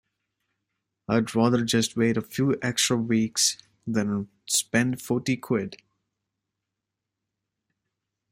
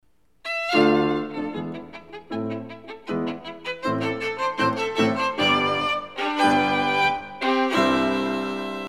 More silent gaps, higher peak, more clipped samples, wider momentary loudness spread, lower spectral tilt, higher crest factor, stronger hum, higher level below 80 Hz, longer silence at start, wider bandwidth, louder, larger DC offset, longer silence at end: neither; about the same, -6 dBFS vs -6 dBFS; neither; second, 7 LU vs 14 LU; about the same, -4 dB/octave vs -5 dB/octave; about the same, 20 dB vs 18 dB; neither; second, -64 dBFS vs -58 dBFS; first, 1.1 s vs 0.45 s; first, 16 kHz vs 14 kHz; about the same, -25 LUFS vs -23 LUFS; second, under 0.1% vs 0.2%; first, 2.55 s vs 0 s